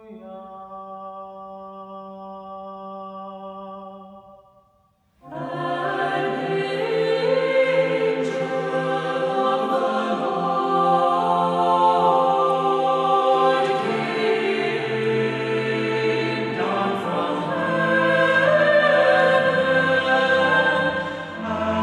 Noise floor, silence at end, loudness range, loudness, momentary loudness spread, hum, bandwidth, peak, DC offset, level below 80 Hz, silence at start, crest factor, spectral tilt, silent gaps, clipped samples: -62 dBFS; 0 s; 19 LU; -20 LUFS; 20 LU; none; 10.5 kHz; -6 dBFS; under 0.1%; -64 dBFS; 0 s; 16 dB; -5.5 dB/octave; none; under 0.1%